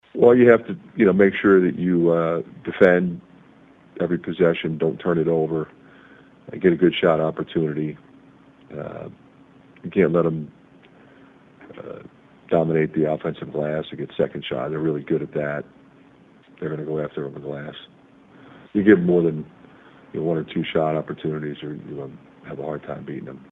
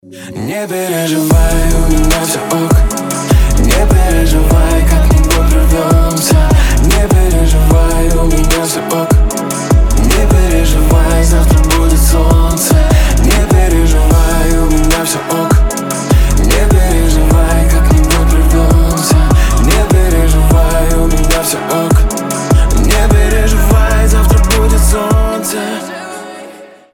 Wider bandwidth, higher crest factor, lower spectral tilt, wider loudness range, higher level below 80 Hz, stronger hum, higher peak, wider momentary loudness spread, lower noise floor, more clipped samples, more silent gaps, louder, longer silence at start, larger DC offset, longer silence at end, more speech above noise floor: second, 4 kHz vs 17.5 kHz; first, 22 dB vs 8 dB; first, -9.5 dB/octave vs -5 dB/octave; first, 8 LU vs 2 LU; second, -58 dBFS vs -10 dBFS; neither; about the same, 0 dBFS vs 0 dBFS; first, 20 LU vs 5 LU; first, -51 dBFS vs -33 dBFS; neither; neither; second, -21 LUFS vs -11 LUFS; about the same, 0.15 s vs 0.1 s; neither; second, 0.1 s vs 0.3 s; first, 31 dB vs 23 dB